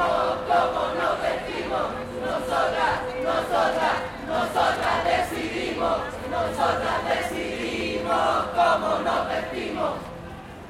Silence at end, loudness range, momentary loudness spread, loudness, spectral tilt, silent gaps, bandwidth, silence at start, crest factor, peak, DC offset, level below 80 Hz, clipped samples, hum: 0 s; 1 LU; 7 LU; -25 LUFS; -4.5 dB/octave; none; 16 kHz; 0 s; 16 dB; -8 dBFS; under 0.1%; -48 dBFS; under 0.1%; none